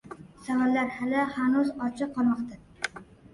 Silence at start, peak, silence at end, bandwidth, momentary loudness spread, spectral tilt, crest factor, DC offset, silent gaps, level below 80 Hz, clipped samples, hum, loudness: 0.05 s; -12 dBFS; 0.3 s; 11.5 kHz; 14 LU; -5.5 dB/octave; 16 dB; under 0.1%; none; -62 dBFS; under 0.1%; none; -28 LUFS